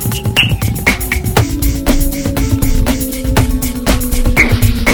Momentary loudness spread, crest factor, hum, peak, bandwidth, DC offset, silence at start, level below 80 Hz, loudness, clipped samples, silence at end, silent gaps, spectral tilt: 5 LU; 12 dB; none; 0 dBFS; over 20 kHz; under 0.1%; 0 s; -16 dBFS; -13 LUFS; 0.2%; 0 s; none; -4.5 dB/octave